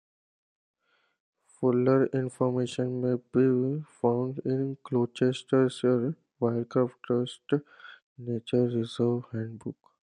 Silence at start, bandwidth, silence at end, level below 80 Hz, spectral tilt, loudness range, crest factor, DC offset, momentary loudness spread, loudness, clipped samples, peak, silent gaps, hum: 1.6 s; 10 kHz; 0.5 s; -74 dBFS; -7.5 dB/octave; 3 LU; 18 dB; under 0.1%; 10 LU; -28 LUFS; under 0.1%; -10 dBFS; 8.02-8.16 s; none